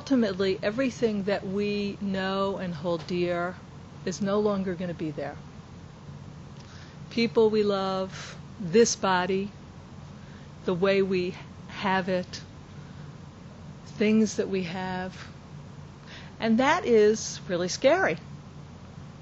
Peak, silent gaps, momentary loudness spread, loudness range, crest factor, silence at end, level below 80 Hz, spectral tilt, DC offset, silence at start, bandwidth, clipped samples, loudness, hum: -8 dBFS; none; 22 LU; 5 LU; 20 dB; 0 s; -58 dBFS; -4.5 dB/octave; under 0.1%; 0 s; 8 kHz; under 0.1%; -27 LUFS; none